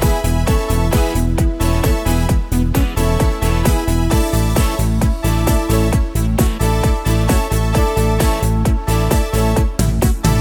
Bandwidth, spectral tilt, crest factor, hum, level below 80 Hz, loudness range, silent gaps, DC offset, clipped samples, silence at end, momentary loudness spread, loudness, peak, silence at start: 19 kHz; -6 dB/octave; 14 dB; none; -18 dBFS; 1 LU; none; under 0.1%; under 0.1%; 0 s; 2 LU; -16 LUFS; 0 dBFS; 0 s